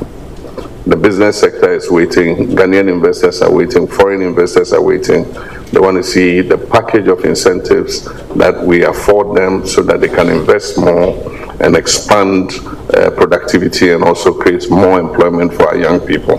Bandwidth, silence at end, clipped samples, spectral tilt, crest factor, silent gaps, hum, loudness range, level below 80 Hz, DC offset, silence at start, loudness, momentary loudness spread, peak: 14 kHz; 0 s; 0.4%; -5 dB/octave; 10 dB; none; none; 1 LU; -34 dBFS; 1%; 0 s; -10 LUFS; 6 LU; 0 dBFS